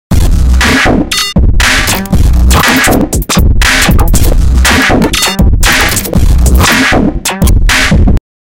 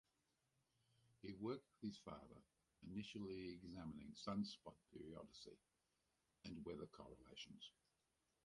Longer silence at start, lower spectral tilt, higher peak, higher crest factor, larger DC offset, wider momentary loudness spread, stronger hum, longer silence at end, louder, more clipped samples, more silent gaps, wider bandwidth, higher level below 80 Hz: second, 0.1 s vs 1.05 s; second, -4 dB/octave vs -6 dB/octave; first, 0 dBFS vs -36 dBFS; second, 6 dB vs 20 dB; neither; second, 4 LU vs 13 LU; neither; second, 0.25 s vs 0.75 s; first, -7 LUFS vs -55 LUFS; first, 0.6% vs under 0.1%; neither; first, 17.5 kHz vs 11 kHz; first, -10 dBFS vs -76 dBFS